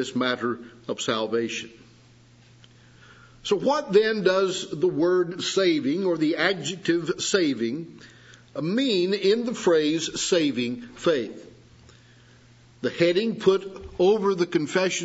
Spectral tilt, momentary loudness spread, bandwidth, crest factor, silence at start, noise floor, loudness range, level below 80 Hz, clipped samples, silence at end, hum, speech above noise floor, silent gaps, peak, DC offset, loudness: -4 dB/octave; 11 LU; 8 kHz; 20 dB; 0 s; -54 dBFS; 5 LU; -62 dBFS; under 0.1%; 0 s; none; 30 dB; none; -6 dBFS; under 0.1%; -24 LUFS